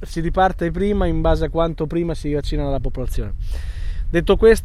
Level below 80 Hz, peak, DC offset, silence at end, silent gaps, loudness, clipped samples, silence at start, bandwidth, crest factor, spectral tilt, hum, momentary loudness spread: -24 dBFS; -2 dBFS; under 0.1%; 0 s; none; -21 LUFS; under 0.1%; 0 s; 12.5 kHz; 16 dB; -7 dB/octave; none; 11 LU